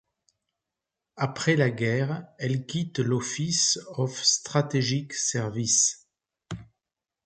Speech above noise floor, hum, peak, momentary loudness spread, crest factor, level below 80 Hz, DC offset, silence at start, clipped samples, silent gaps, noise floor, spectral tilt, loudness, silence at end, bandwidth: 61 dB; none; -8 dBFS; 10 LU; 20 dB; -64 dBFS; under 0.1%; 1.15 s; under 0.1%; none; -87 dBFS; -3.5 dB/octave; -25 LUFS; 0.6 s; 9.4 kHz